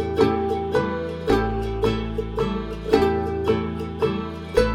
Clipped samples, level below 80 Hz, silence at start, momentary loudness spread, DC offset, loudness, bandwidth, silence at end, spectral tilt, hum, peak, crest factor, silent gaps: under 0.1%; -34 dBFS; 0 s; 7 LU; under 0.1%; -23 LUFS; 15.5 kHz; 0 s; -7 dB/octave; none; -2 dBFS; 20 dB; none